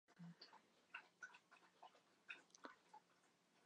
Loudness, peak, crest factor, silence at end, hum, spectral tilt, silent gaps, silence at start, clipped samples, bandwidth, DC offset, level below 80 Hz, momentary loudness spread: -62 LUFS; -38 dBFS; 28 dB; 0 s; none; -3.5 dB/octave; none; 0.1 s; under 0.1%; 10 kHz; under 0.1%; under -90 dBFS; 10 LU